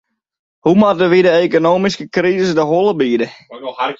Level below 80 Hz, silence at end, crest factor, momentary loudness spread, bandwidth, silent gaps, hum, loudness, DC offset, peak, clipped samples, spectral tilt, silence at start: -56 dBFS; 0.05 s; 12 dB; 10 LU; 7.8 kHz; none; none; -14 LUFS; under 0.1%; -2 dBFS; under 0.1%; -6.5 dB/octave; 0.65 s